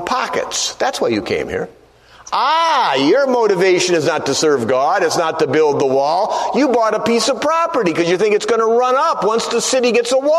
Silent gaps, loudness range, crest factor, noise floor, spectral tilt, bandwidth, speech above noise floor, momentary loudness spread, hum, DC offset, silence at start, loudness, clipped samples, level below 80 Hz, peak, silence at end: none; 2 LU; 14 dB; -42 dBFS; -3.5 dB/octave; 13.5 kHz; 27 dB; 5 LU; none; under 0.1%; 0 s; -15 LUFS; under 0.1%; -54 dBFS; -2 dBFS; 0 s